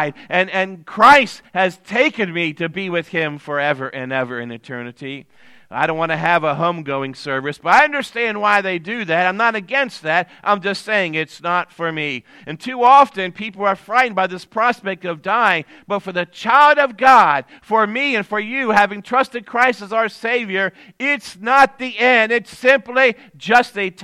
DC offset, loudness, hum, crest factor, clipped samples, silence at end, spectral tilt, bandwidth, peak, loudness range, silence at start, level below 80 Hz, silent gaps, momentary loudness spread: under 0.1%; -17 LUFS; none; 18 dB; under 0.1%; 0 s; -4.5 dB/octave; 14.5 kHz; 0 dBFS; 6 LU; 0 s; -60 dBFS; none; 13 LU